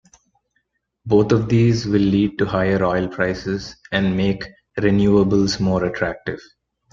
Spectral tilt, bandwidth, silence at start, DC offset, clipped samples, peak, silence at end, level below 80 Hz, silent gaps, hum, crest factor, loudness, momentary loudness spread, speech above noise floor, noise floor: -7 dB/octave; 7.6 kHz; 1.05 s; under 0.1%; under 0.1%; -2 dBFS; 0.55 s; -44 dBFS; none; none; 16 dB; -19 LUFS; 12 LU; 52 dB; -70 dBFS